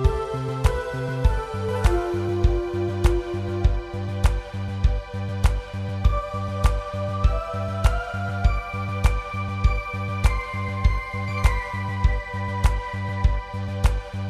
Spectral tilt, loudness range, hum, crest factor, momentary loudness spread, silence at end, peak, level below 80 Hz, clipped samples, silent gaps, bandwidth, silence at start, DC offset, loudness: -6.5 dB/octave; 1 LU; none; 18 dB; 5 LU; 0 s; -6 dBFS; -24 dBFS; under 0.1%; none; 13.5 kHz; 0 s; under 0.1%; -25 LUFS